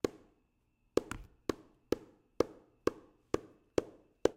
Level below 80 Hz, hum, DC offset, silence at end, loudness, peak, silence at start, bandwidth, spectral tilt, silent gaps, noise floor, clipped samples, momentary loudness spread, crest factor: -60 dBFS; none; under 0.1%; 0.05 s; -39 LUFS; -10 dBFS; 0.05 s; 16 kHz; -5.5 dB/octave; none; -76 dBFS; under 0.1%; 9 LU; 28 dB